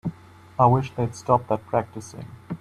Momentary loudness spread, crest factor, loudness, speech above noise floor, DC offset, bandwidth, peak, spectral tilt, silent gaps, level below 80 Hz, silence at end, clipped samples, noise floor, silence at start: 18 LU; 20 dB; -23 LUFS; 21 dB; under 0.1%; 11.5 kHz; -4 dBFS; -7.5 dB/octave; none; -54 dBFS; 0.05 s; under 0.1%; -44 dBFS; 0.05 s